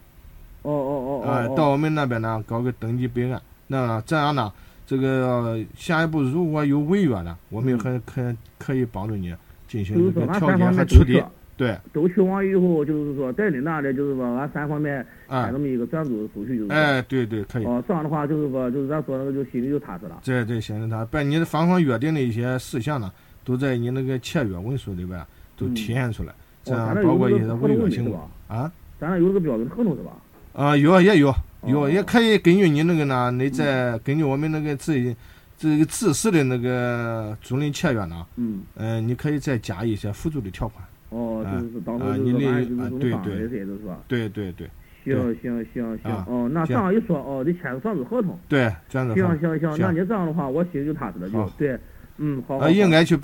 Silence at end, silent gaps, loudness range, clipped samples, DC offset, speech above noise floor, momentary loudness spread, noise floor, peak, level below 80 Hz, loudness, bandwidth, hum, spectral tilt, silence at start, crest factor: 0 s; none; 7 LU; under 0.1%; under 0.1%; 23 dB; 11 LU; -45 dBFS; 0 dBFS; -36 dBFS; -23 LUFS; 17.5 kHz; none; -7 dB/octave; 0.25 s; 22 dB